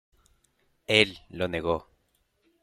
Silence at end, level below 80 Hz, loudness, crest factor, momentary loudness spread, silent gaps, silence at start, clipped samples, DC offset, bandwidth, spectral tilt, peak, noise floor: 0.8 s; -58 dBFS; -26 LUFS; 28 dB; 11 LU; none; 0.9 s; under 0.1%; under 0.1%; 15.5 kHz; -4 dB/octave; -4 dBFS; -72 dBFS